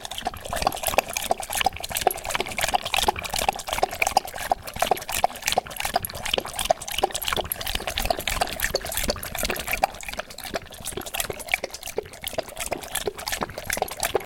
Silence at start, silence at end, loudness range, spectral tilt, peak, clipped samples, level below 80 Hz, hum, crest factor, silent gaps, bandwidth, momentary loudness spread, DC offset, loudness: 0 s; 0 s; 5 LU; -1.5 dB/octave; -2 dBFS; under 0.1%; -42 dBFS; none; 26 dB; none; 17 kHz; 8 LU; under 0.1%; -26 LUFS